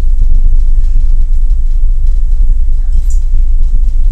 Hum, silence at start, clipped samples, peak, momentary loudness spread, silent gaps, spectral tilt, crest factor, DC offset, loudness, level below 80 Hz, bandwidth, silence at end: none; 0 s; 2%; 0 dBFS; 2 LU; none; -7.5 dB/octave; 6 dB; under 0.1%; -15 LUFS; -6 dBFS; 0.5 kHz; 0 s